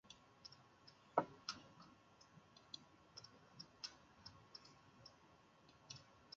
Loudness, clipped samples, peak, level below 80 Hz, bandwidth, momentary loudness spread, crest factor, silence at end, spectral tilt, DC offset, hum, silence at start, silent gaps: -52 LUFS; under 0.1%; -22 dBFS; -82 dBFS; 7.4 kHz; 23 LU; 34 dB; 0 s; -2.5 dB/octave; under 0.1%; none; 0.05 s; none